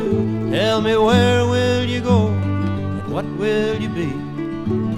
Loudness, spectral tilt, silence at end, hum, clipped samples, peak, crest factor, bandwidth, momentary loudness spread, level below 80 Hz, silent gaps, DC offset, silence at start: -19 LUFS; -6.5 dB/octave; 0 s; none; under 0.1%; -2 dBFS; 16 dB; 11.5 kHz; 10 LU; -44 dBFS; none; under 0.1%; 0 s